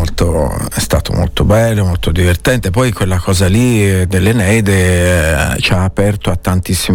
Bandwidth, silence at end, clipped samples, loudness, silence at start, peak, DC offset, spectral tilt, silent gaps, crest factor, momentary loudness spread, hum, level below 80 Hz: 17.5 kHz; 0 s; under 0.1%; -12 LUFS; 0 s; -2 dBFS; under 0.1%; -5.5 dB/octave; none; 10 dB; 5 LU; none; -22 dBFS